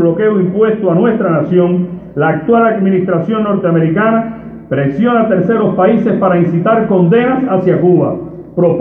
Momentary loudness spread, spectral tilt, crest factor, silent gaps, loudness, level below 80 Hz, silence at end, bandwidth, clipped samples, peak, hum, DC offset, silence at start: 6 LU; -11 dB/octave; 10 dB; none; -12 LUFS; -46 dBFS; 0 s; 3.7 kHz; under 0.1%; 0 dBFS; none; under 0.1%; 0 s